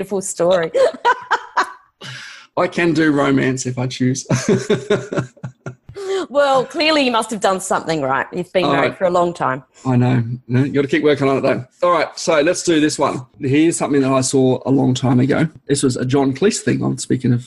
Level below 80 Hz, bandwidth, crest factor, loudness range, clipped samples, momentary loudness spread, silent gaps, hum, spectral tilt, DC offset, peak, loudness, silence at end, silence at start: -52 dBFS; 12.5 kHz; 12 dB; 3 LU; under 0.1%; 9 LU; none; none; -5 dB/octave; under 0.1%; -4 dBFS; -17 LUFS; 0 s; 0 s